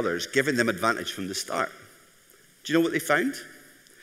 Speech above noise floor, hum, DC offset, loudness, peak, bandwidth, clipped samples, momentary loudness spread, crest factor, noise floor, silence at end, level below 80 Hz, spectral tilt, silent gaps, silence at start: 31 dB; none; under 0.1%; -26 LUFS; -8 dBFS; 16 kHz; under 0.1%; 10 LU; 20 dB; -57 dBFS; 0.45 s; -70 dBFS; -3.5 dB/octave; none; 0 s